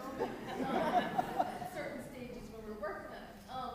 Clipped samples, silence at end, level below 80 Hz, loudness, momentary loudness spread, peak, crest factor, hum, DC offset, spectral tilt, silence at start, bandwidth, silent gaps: under 0.1%; 0 s; -62 dBFS; -39 LUFS; 14 LU; -20 dBFS; 20 dB; none; under 0.1%; -5.5 dB/octave; 0 s; 15.5 kHz; none